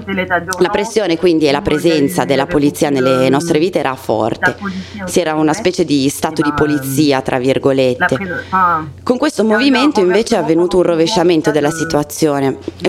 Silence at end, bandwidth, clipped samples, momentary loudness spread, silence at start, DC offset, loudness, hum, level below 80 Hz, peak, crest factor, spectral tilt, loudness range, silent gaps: 0 s; 16 kHz; under 0.1%; 5 LU; 0 s; under 0.1%; -14 LUFS; none; -44 dBFS; 0 dBFS; 12 dB; -5 dB/octave; 2 LU; none